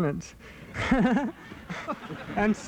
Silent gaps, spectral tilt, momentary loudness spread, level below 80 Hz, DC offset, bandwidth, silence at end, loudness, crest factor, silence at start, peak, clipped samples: none; -6.5 dB/octave; 20 LU; -46 dBFS; under 0.1%; 11 kHz; 0 s; -29 LUFS; 18 dB; 0 s; -10 dBFS; under 0.1%